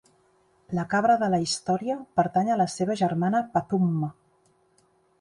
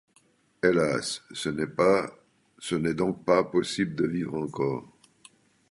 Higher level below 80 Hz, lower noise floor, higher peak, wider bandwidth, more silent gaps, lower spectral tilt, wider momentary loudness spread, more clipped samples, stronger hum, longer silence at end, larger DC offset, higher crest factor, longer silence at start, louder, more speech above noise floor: about the same, -64 dBFS vs -60 dBFS; about the same, -65 dBFS vs -65 dBFS; about the same, -8 dBFS vs -6 dBFS; about the same, 11.5 kHz vs 11.5 kHz; neither; about the same, -6 dB/octave vs -5.5 dB/octave; about the same, 7 LU vs 9 LU; neither; neither; first, 1.1 s vs 0.85 s; neither; about the same, 18 dB vs 22 dB; about the same, 0.7 s vs 0.65 s; about the same, -25 LUFS vs -27 LUFS; about the same, 40 dB vs 38 dB